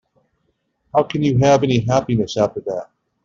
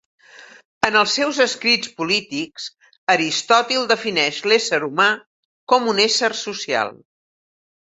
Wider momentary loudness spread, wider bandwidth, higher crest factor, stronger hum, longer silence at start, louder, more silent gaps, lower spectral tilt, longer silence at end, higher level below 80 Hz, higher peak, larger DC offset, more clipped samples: about the same, 12 LU vs 11 LU; second, 7.6 kHz vs 8.4 kHz; about the same, 16 dB vs 20 dB; neither; first, 0.95 s vs 0.4 s; about the same, -18 LUFS vs -18 LUFS; second, none vs 0.65-0.81 s, 2.98-3.07 s, 5.26-5.67 s; first, -6.5 dB/octave vs -2 dB/octave; second, 0.4 s vs 0.9 s; first, -48 dBFS vs -64 dBFS; second, -4 dBFS vs 0 dBFS; neither; neither